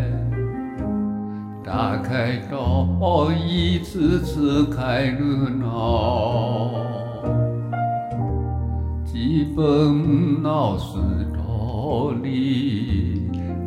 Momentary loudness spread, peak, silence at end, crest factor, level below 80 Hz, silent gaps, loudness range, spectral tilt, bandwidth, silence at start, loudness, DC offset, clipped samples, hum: 7 LU; -6 dBFS; 0 s; 16 dB; -34 dBFS; none; 3 LU; -8 dB/octave; 12 kHz; 0 s; -22 LUFS; under 0.1%; under 0.1%; none